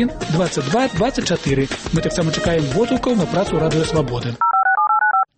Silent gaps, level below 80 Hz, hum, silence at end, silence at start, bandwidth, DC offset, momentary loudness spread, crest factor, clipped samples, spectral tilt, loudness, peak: none; -38 dBFS; none; 0.15 s; 0 s; 8.8 kHz; under 0.1%; 5 LU; 12 dB; under 0.1%; -5.5 dB/octave; -18 LUFS; -4 dBFS